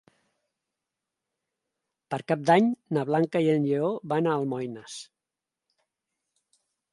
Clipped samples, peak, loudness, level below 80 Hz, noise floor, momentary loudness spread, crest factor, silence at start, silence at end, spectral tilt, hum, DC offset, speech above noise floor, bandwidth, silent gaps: under 0.1%; -6 dBFS; -26 LUFS; -76 dBFS; -88 dBFS; 14 LU; 22 dB; 2.1 s; 1.9 s; -7 dB/octave; none; under 0.1%; 63 dB; 11.5 kHz; none